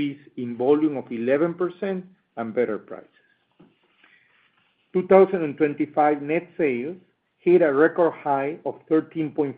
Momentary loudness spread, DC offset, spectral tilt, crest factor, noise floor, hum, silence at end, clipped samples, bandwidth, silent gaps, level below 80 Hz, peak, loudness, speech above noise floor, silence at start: 16 LU; under 0.1%; -6.5 dB/octave; 20 dB; -65 dBFS; none; 0.05 s; under 0.1%; 4.3 kHz; none; -72 dBFS; -2 dBFS; -23 LUFS; 43 dB; 0 s